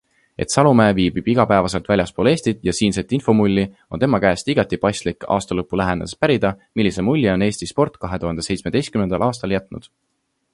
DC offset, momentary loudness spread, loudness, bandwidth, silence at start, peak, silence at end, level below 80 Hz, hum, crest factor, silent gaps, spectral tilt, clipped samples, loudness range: under 0.1%; 8 LU; -19 LUFS; 11.5 kHz; 0.4 s; 0 dBFS; 0.75 s; -42 dBFS; none; 18 dB; none; -6 dB/octave; under 0.1%; 3 LU